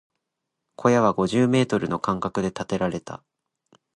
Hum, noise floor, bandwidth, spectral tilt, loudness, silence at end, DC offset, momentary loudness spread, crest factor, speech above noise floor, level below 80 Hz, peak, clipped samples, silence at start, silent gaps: none; -82 dBFS; 11 kHz; -6.5 dB/octave; -23 LUFS; 0.8 s; under 0.1%; 11 LU; 20 dB; 59 dB; -56 dBFS; -6 dBFS; under 0.1%; 0.8 s; none